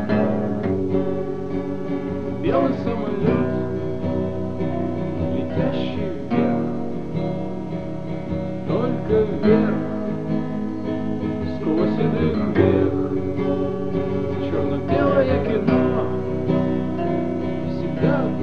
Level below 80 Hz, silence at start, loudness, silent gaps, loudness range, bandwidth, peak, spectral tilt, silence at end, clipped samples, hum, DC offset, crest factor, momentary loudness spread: -46 dBFS; 0 s; -22 LUFS; none; 3 LU; 6.8 kHz; -2 dBFS; -9.5 dB/octave; 0 s; under 0.1%; none; 2%; 18 dB; 8 LU